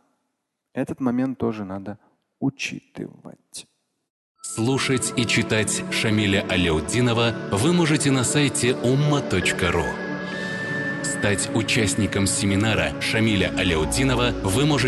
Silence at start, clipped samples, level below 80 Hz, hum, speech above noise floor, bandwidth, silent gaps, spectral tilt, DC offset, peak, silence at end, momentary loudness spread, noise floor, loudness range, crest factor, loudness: 0.75 s; under 0.1%; -40 dBFS; none; 56 dB; 12.5 kHz; 4.10-4.35 s; -4.5 dB/octave; under 0.1%; -8 dBFS; 0 s; 12 LU; -78 dBFS; 8 LU; 14 dB; -22 LUFS